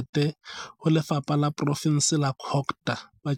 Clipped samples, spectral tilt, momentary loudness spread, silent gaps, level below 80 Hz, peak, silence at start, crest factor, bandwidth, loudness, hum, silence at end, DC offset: under 0.1%; -5 dB/octave; 9 LU; 0.09-0.13 s; -66 dBFS; -10 dBFS; 0 s; 16 dB; 15 kHz; -26 LUFS; none; 0 s; under 0.1%